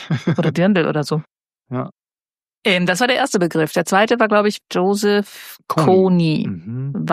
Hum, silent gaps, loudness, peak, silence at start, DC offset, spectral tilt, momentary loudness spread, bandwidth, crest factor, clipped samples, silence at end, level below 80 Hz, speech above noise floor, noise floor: none; 2.57-2.61 s; -17 LUFS; 0 dBFS; 0 s; under 0.1%; -5.5 dB/octave; 13 LU; 15.5 kHz; 16 dB; under 0.1%; 0 s; -62 dBFS; over 73 dB; under -90 dBFS